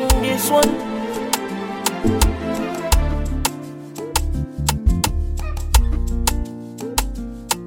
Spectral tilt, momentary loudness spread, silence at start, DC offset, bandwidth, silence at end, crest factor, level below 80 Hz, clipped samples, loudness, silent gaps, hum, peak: -4.5 dB/octave; 10 LU; 0 s; under 0.1%; 17 kHz; 0 s; 20 dB; -22 dBFS; under 0.1%; -21 LUFS; none; none; 0 dBFS